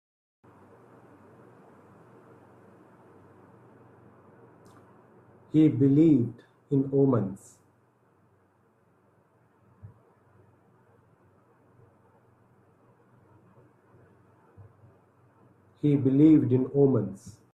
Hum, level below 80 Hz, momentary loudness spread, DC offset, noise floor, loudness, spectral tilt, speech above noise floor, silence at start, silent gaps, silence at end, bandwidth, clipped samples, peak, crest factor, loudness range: none; -66 dBFS; 16 LU; under 0.1%; -65 dBFS; -24 LUFS; -10.5 dB/octave; 43 dB; 5.55 s; none; 0.25 s; 8.6 kHz; under 0.1%; -10 dBFS; 20 dB; 8 LU